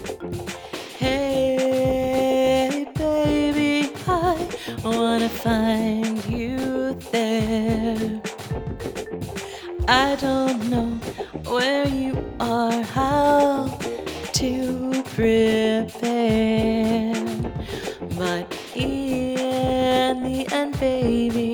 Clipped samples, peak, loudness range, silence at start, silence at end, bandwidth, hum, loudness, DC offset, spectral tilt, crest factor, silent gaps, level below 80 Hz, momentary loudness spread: under 0.1%; -2 dBFS; 3 LU; 0 s; 0 s; over 20 kHz; none; -22 LUFS; under 0.1%; -5.5 dB/octave; 20 dB; none; -40 dBFS; 11 LU